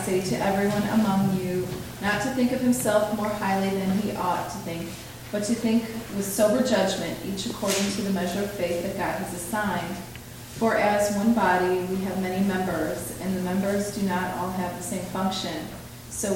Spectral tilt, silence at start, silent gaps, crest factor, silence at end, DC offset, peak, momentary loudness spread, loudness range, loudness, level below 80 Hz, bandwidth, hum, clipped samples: -5 dB/octave; 0 s; none; 18 dB; 0 s; under 0.1%; -8 dBFS; 10 LU; 3 LU; -26 LUFS; -50 dBFS; 17 kHz; none; under 0.1%